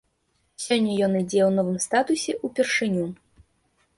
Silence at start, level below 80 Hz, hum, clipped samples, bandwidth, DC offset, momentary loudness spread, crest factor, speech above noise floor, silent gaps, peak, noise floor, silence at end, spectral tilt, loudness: 0.6 s; -62 dBFS; none; under 0.1%; 11.5 kHz; under 0.1%; 7 LU; 16 dB; 47 dB; none; -8 dBFS; -70 dBFS; 0.85 s; -4.5 dB/octave; -23 LUFS